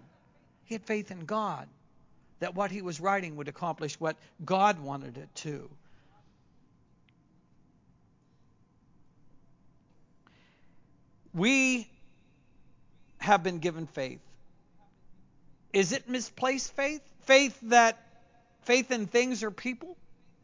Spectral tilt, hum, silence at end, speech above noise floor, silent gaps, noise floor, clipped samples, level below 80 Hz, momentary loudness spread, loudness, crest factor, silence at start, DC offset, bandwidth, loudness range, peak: -3.5 dB/octave; none; 0.3 s; 35 dB; none; -65 dBFS; under 0.1%; -70 dBFS; 19 LU; -29 LUFS; 24 dB; 0.7 s; under 0.1%; 7.6 kHz; 8 LU; -8 dBFS